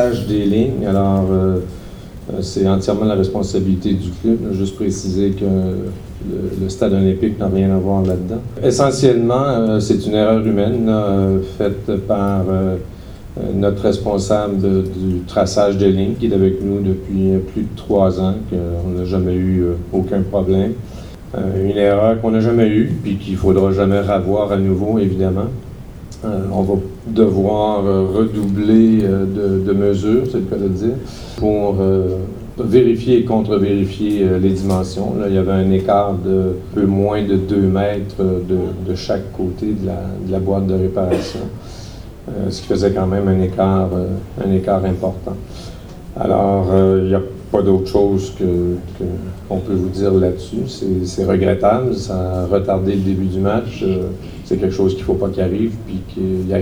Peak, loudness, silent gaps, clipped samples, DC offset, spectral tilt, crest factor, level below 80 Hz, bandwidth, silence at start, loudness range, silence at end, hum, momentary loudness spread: 0 dBFS; -17 LUFS; none; under 0.1%; under 0.1%; -8 dB/octave; 16 dB; -36 dBFS; 12 kHz; 0 s; 4 LU; 0 s; none; 10 LU